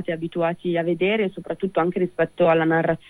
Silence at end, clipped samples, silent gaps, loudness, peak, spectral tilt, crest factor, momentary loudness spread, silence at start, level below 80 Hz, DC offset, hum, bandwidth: 0.15 s; under 0.1%; none; -22 LUFS; -8 dBFS; -8 dB/octave; 14 dB; 7 LU; 0 s; -58 dBFS; under 0.1%; none; 10.5 kHz